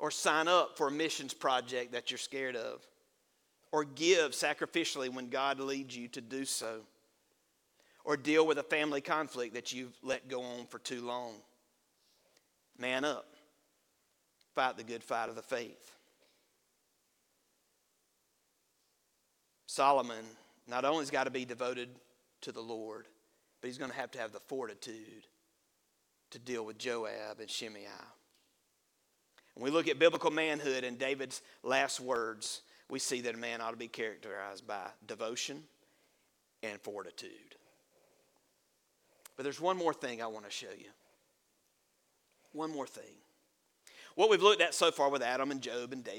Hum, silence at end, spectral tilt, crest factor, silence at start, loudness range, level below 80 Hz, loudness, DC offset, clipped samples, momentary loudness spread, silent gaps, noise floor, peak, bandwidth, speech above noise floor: none; 0 s; -2.5 dB/octave; 26 dB; 0 s; 12 LU; -86 dBFS; -35 LUFS; under 0.1%; under 0.1%; 18 LU; none; -77 dBFS; -10 dBFS; 18 kHz; 42 dB